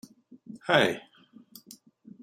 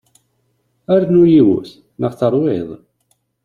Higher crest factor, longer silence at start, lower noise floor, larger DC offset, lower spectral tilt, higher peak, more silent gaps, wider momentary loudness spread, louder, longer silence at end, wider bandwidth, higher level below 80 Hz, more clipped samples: first, 26 dB vs 14 dB; second, 0.5 s vs 0.9 s; second, -54 dBFS vs -64 dBFS; neither; second, -4.5 dB/octave vs -9.5 dB/octave; second, -6 dBFS vs -2 dBFS; neither; first, 25 LU vs 13 LU; second, -26 LUFS vs -14 LUFS; first, 1.25 s vs 0.7 s; first, 16 kHz vs 4.9 kHz; second, -72 dBFS vs -54 dBFS; neither